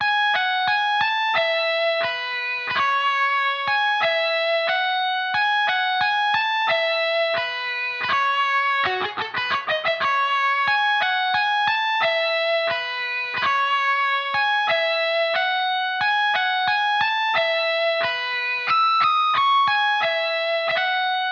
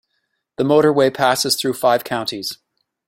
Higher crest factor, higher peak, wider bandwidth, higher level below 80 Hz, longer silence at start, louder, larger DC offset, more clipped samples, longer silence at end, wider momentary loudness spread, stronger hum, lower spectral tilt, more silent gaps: about the same, 12 dB vs 16 dB; second, -8 dBFS vs -2 dBFS; second, 7 kHz vs 16.5 kHz; second, -72 dBFS vs -60 dBFS; second, 0 s vs 0.6 s; second, -20 LUFS vs -17 LUFS; neither; neither; second, 0 s vs 0.55 s; second, 4 LU vs 14 LU; neither; second, 3 dB/octave vs -4 dB/octave; neither